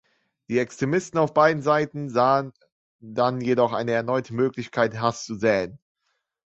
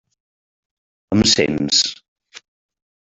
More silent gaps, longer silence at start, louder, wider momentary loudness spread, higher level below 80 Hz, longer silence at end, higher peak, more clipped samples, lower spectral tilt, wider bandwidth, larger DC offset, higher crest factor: first, 2.72-2.99 s vs 2.08-2.16 s; second, 0.5 s vs 1.1 s; second, -23 LUFS vs -16 LUFS; about the same, 7 LU vs 8 LU; second, -62 dBFS vs -50 dBFS; first, 0.8 s vs 0.6 s; about the same, -4 dBFS vs -2 dBFS; neither; first, -6 dB/octave vs -3 dB/octave; about the same, 8.2 kHz vs 8.4 kHz; neither; about the same, 20 dB vs 20 dB